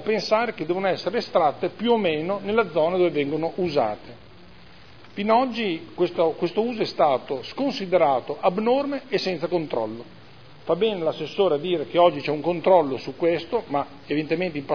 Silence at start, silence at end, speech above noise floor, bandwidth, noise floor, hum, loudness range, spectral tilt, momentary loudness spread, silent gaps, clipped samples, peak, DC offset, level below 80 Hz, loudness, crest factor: 0 s; 0 s; 25 dB; 5.4 kHz; -48 dBFS; none; 3 LU; -6.5 dB/octave; 8 LU; none; under 0.1%; -4 dBFS; 0.4%; -62 dBFS; -23 LUFS; 18 dB